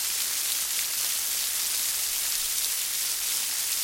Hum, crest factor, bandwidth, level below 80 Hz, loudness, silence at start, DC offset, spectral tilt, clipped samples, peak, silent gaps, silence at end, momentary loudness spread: none; 22 dB; 17 kHz; -62 dBFS; -25 LUFS; 0 s; under 0.1%; 3 dB/octave; under 0.1%; -6 dBFS; none; 0 s; 1 LU